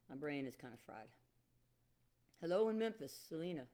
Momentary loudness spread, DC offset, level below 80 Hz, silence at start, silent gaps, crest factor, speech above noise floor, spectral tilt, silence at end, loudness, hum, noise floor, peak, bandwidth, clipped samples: 19 LU; under 0.1%; -82 dBFS; 0.1 s; none; 18 dB; 35 dB; -6 dB/octave; 0.05 s; -43 LUFS; none; -78 dBFS; -26 dBFS; 19.5 kHz; under 0.1%